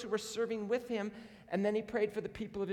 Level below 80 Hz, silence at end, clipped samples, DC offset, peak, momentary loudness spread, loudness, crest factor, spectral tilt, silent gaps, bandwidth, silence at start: -68 dBFS; 0 s; under 0.1%; under 0.1%; -22 dBFS; 8 LU; -37 LUFS; 16 dB; -5 dB/octave; none; 15 kHz; 0 s